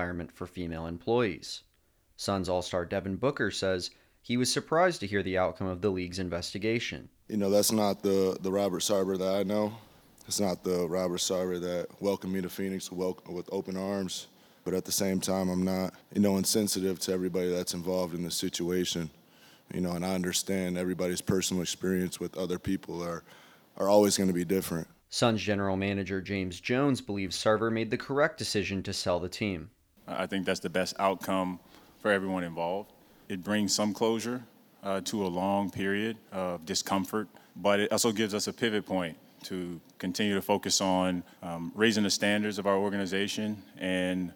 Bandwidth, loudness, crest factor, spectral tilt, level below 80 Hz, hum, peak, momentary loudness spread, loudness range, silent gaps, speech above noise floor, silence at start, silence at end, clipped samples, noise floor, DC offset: 18.5 kHz; -30 LUFS; 22 dB; -4 dB/octave; -62 dBFS; none; -10 dBFS; 10 LU; 4 LU; none; 38 dB; 0 s; 0 s; under 0.1%; -68 dBFS; under 0.1%